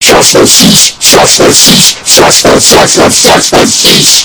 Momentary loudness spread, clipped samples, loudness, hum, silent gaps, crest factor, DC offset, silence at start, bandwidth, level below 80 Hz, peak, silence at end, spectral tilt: 3 LU; 30%; -1 LUFS; none; none; 4 dB; under 0.1%; 0 s; over 20 kHz; -30 dBFS; 0 dBFS; 0 s; -2 dB/octave